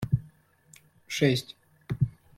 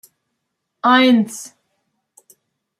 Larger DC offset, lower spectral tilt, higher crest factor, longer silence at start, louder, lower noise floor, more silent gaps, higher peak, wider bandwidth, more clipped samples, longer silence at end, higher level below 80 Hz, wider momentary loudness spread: neither; first, -6 dB/octave vs -4 dB/octave; about the same, 20 dB vs 18 dB; second, 0 s vs 0.85 s; second, -29 LUFS vs -15 LUFS; second, -58 dBFS vs -75 dBFS; neither; second, -10 dBFS vs -2 dBFS; first, 15.5 kHz vs 14 kHz; neither; second, 0.25 s vs 1.35 s; first, -52 dBFS vs -74 dBFS; about the same, 19 LU vs 21 LU